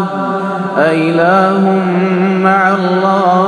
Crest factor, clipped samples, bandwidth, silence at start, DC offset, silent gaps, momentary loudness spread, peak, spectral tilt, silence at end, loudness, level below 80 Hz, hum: 10 dB; under 0.1%; 10 kHz; 0 s; under 0.1%; none; 6 LU; 0 dBFS; -7.5 dB/octave; 0 s; -11 LUFS; -56 dBFS; none